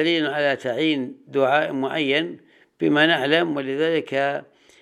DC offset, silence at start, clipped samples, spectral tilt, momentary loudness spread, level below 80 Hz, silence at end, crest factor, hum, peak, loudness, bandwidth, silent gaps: under 0.1%; 0 s; under 0.1%; -5.5 dB/octave; 8 LU; -76 dBFS; 0.4 s; 20 dB; none; -2 dBFS; -21 LUFS; 10.5 kHz; none